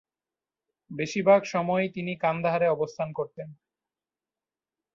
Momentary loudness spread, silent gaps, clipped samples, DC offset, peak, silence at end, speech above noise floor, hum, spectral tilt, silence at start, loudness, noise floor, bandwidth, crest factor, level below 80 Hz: 16 LU; none; under 0.1%; under 0.1%; -8 dBFS; 1.4 s; over 64 dB; none; -6 dB/octave; 0.9 s; -26 LUFS; under -90 dBFS; 7.6 kHz; 20 dB; -70 dBFS